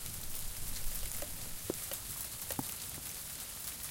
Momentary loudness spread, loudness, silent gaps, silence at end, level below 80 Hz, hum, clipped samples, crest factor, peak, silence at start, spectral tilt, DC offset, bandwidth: 3 LU; -40 LUFS; none; 0 s; -48 dBFS; none; under 0.1%; 22 dB; -18 dBFS; 0 s; -2 dB/octave; under 0.1%; 17 kHz